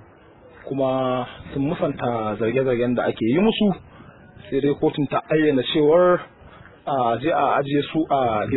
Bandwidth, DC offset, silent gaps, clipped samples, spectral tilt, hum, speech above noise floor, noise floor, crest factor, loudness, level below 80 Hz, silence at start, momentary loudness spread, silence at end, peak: 4.1 kHz; under 0.1%; none; under 0.1%; -11 dB/octave; none; 28 dB; -48 dBFS; 16 dB; -21 LUFS; -52 dBFS; 0.65 s; 9 LU; 0 s; -6 dBFS